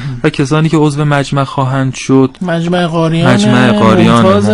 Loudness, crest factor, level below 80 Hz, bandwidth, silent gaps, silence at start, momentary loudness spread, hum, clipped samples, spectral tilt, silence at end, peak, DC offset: -10 LUFS; 10 dB; -36 dBFS; 11 kHz; none; 0 s; 7 LU; none; 0.9%; -6.5 dB/octave; 0 s; 0 dBFS; under 0.1%